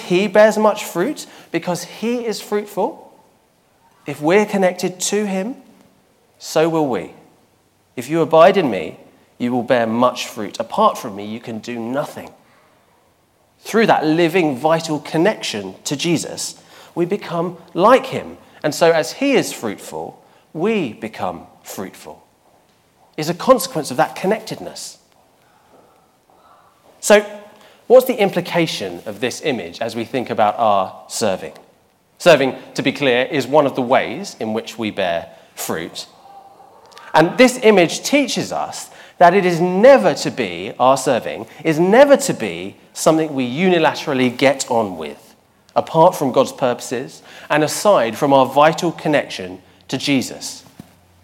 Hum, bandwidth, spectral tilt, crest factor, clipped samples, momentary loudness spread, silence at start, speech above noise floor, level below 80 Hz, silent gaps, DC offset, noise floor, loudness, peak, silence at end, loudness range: none; 17 kHz; -4.5 dB/octave; 18 dB; under 0.1%; 17 LU; 0 s; 41 dB; -62 dBFS; none; under 0.1%; -58 dBFS; -17 LUFS; 0 dBFS; 0.65 s; 7 LU